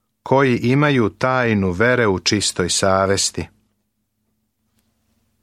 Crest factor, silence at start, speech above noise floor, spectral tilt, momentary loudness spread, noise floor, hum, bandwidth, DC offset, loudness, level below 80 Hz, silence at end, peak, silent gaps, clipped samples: 18 dB; 0.25 s; 54 dB; -4 dB/octave; 4 LU; -71 dBFS; none; 14.5 kHz; under 0.1%; -17 LUFS; -50 dBFS; 1.95 s; -2 dBFS; none; under 0.1%